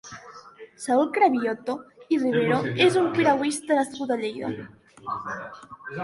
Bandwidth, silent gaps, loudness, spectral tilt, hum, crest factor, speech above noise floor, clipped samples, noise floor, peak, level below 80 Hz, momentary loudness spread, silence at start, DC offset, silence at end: 11.5 kHz; none; -24 LUFS; -5 dB/octave; none; 18 dB; 22 dB; under 0.1%; -46 dBFS; -8 dBFS; -66 dBFS; 19 LU; 0.05 s; under 0.1%; 0 s